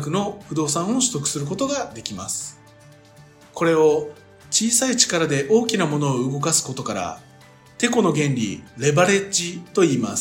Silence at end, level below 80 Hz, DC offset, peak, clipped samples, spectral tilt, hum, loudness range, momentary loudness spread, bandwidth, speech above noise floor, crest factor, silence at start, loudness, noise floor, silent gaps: 0 s; -60 dBFS; under 0.1%; 0 dBFS; under 0.1%; -3.5 dB/octave; none; 5 LU; 11 LU; 16.5 kHz; 28 dB; 22 dB; 0 s; -20 LUFS; -48 dBFS; none